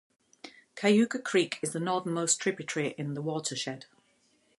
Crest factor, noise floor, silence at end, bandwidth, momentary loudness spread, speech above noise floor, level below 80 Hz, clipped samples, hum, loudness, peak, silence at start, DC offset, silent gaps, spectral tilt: 20 dB; -69 dBFS; 0.75 s; 11.5 kHz; 20 LU; 39 dB; -78 dBFS; under 0.1%; none; -30 LUFS; -12 dBFS; 0.45 s; under 0.1%; none; -4 dB/octave